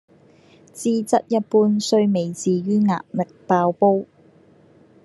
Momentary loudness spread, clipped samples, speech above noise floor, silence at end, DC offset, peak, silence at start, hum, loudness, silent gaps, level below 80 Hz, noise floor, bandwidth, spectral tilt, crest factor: 8 LU; under 0.1%; 33 dB; 1 s; under 0.1%; -2 dBFS; 0.75 s; none; -20 LUFS; none; -70 dBFS; -52 dBFS; 12 kHz; -6 dB/octave; 18 dB